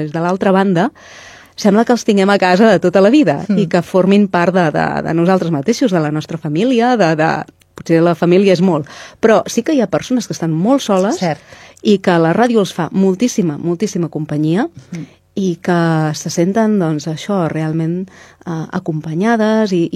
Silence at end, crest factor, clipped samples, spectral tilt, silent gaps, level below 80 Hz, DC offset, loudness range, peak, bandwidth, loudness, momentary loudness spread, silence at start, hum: 0 s; 14 dB; under 0.1%; -6.5 dB/octave; none; -56 dBFS; under 0.1%; 5 LU; 0 dBFS; 13.5 kHz; -14 LUFS; 10 LU; 0 s; none